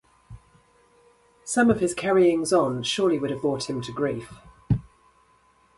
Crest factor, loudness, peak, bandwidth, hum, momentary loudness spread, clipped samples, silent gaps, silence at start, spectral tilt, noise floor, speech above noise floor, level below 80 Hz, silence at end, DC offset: 20 dB; -24 LUFS; -6 dBFS; 11.5 kHz; none; 10 LU; under 0.1%; none; 0.3 s; -5 dB/octave; -61 dBFS; 38 dB; -50 dBFS; 0.95 s; under 0.1%